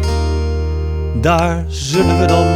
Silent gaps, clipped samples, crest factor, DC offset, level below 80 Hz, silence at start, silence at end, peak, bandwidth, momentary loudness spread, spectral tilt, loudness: none; under 0.1%; 14 dB; under 0.1%; -24 dBFS; 0 s; 0 s; 0 dBFS; 13.5 kHz; 7 LU; -6 dB/octave; -16 LUFS